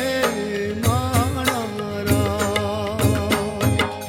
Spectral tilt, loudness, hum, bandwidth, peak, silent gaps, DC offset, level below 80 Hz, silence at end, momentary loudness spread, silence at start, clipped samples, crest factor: -5 dB/octave; -21 LUFS; none; 17 kHz; -4 dBFS; none; under 0.1%; -44 dBFS; 0 s; 5 LU; 0 s; under 0.1%; 18 dB